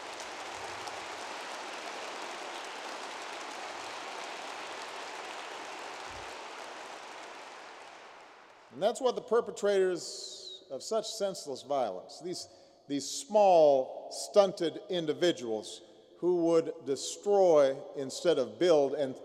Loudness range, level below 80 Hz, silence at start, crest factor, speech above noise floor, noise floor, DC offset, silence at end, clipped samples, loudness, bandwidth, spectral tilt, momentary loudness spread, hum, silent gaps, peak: 13 LU; -78 dBFS; 0 s; 22 dB; 26 dB; -55 dBFS; under 0.1%; 0 s; under 0.1%; -32 LUFS; 14 kHz; -3.5 dB/octave; 18 LU; none; none; -10 dBFS